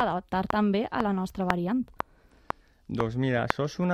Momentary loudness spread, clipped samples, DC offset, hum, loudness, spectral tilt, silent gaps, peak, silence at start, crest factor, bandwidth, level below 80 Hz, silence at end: 13 LU; under 0.1%; under 0.1%; none; -29 LUFS; -7 dB/octave; none; -2 dBFS; 0 s; 26 dB; 14 kHz; -52 dBFS; 0 s